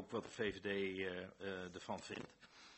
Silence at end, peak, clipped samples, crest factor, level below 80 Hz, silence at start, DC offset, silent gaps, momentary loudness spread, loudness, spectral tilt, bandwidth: 0 s; -26 dBFS; under 0.1%; 20 dB; -74 dBFS; 0 s; under 0.1%; none; 10 LU; -45 LUFS; -4.5 dB/octave; 8.2 kHz